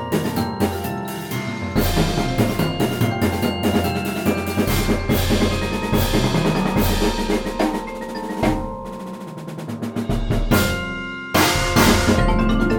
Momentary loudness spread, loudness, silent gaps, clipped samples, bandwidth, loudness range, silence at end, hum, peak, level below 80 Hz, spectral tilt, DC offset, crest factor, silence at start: 11 LU; -20 LUFS; none; under 0.1%; 17.5 kHz; 4 LU; 0 s; none; -2 dBFS; -28 dBFS; -5 dB/octave; under 0.1%; 18 dB; 0 s